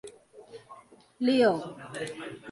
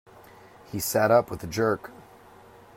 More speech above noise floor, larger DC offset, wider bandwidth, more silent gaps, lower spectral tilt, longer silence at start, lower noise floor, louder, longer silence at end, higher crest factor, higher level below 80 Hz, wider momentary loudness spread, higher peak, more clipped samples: about the same, 25 dB vs 27 dB; neither; second, 11.5 kHz vs 16 kHz; neither; about the same, -5 dB/octave vs -4.5 dB/octave; second, 0.05 s vs 0.7 s; about the same, -53 dBFS vs -51 dBFS; second, -28 LUFS vs -25 LUFS; second, 0 s vs 0.75 s; about the same, 18 dB vs 20 dB; second, -72 dBFS vs -58 dBFS; first, 26 LU vs 15 LU; second, -12 dBFS vs -8 dBFS; neither